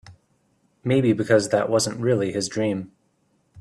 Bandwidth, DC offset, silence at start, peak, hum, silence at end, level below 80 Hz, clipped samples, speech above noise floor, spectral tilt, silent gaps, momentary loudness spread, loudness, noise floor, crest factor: 13.5 kHz; under 0.1%; 0.1 s; -6 dBFS; none; 0 s; -62 dBFS; under 0.1%; 45 dB; -5 dB/octave; none; 11 LU; -22 LUFS; -66 dBFS; 18 dB